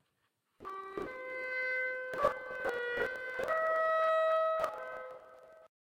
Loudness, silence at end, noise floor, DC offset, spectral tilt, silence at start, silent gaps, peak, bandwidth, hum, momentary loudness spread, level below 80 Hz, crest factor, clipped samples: -34 LUFS; 0.15 s; -80 dBFS; under 0.1%; -4 dB/octave; 0.6 s; none; -18 dBFS; 16.5 kHz; none; 16 LU; -68 dBFS; 18 dB; under 0.1%